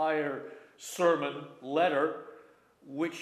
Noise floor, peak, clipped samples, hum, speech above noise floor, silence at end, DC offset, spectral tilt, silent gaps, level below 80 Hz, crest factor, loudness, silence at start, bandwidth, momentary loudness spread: -58 dBFS; -12 dBFS; under 0.1%; none; 27 dB; 0 s; under 0.1%; -4.5 dB/octave; none; -88 dBFS; 20 dB; -31 LUFS; 0 s; 15 kHz; 17 LU